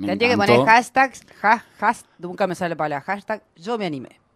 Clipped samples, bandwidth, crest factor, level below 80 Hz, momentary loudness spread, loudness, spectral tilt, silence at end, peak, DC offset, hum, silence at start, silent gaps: under 0.1%; 15 kHz; 20 dB; -62 dBFS; 15 LU; -20 LUFS; -5 dB/octave; 0.3 s; 0 dBFS; under 0.1%; none; 0 s; none